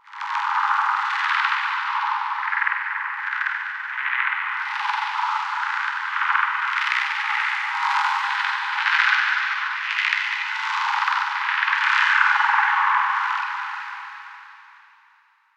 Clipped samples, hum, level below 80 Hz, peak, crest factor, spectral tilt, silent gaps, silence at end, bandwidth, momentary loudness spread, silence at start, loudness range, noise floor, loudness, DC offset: under 0.1%; none; under -90 dBFS; -4 dBFS; 20 dB; 7.5 dB/octave; none; 0.9 s; 12 kHz; 8 LU; 0.05 s; 4 LU; -59 dBFS; -21 LUFS; under 0.1%